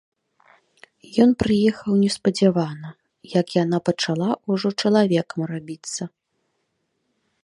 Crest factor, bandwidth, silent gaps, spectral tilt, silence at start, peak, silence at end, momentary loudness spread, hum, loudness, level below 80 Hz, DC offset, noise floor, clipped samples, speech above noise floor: 20 dB; 11.5 kHz; none; -6 dB/octave; 1.1 s; -4 dBFS; 1.35 s; 13 LU; none; -21 LUFS; -54 dBFS; under 0.1%; -73 dBFS; under 0.1%; 52 dB